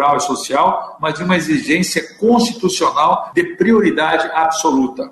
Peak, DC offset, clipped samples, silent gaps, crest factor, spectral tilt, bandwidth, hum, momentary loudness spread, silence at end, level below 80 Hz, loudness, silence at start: -2 dBFS; under 0.1%; under 0.1%; none; 12 dB; -4 dB/octave; 12.5 kHz; none; 5 LU; 0 s; -52 dBFS; -15 LUFS; 0 s